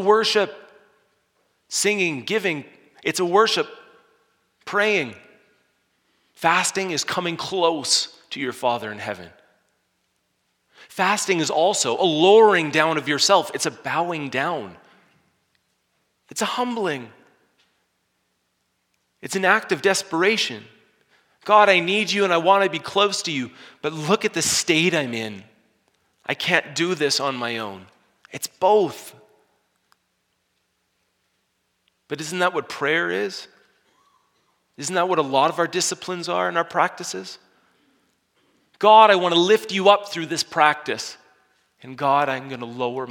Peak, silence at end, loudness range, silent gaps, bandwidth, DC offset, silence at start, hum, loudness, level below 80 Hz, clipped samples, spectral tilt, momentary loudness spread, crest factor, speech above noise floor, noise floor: 0 dBFS; 0 s; 10 LU; none; 18 kHz; under 0.1%; 0 s; none; -20 LUFS; -72 dBFS; under 0.1%; -3 dB/octave; 15 LU; 22 dB; 51 dB; -72 dBFS